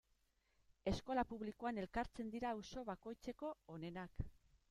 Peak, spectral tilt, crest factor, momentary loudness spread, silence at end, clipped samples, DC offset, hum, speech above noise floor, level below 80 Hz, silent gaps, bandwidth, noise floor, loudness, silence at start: -26 dBFS; -6 dB/octave; 20 dB; 9 LU; 0.4 s; under 0.1%; under 0.1%; none; 35 dB; -60 dBFS; none; 14 kHz; -81 dBFS; -47 LUFS; 0.85 s